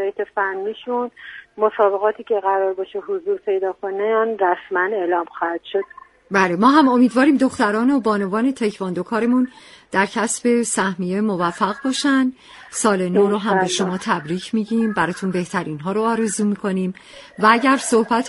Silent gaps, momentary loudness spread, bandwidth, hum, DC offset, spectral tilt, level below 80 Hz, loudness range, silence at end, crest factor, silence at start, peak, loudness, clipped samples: none; 10 LU; 11.5 kHz; none; under 0.1%; -4.5 dB/octave; -62 dBFS; 4 LU; 0 s; 18 dB; 0 s; 0 dBFS; -19 LUFS; under 0.1%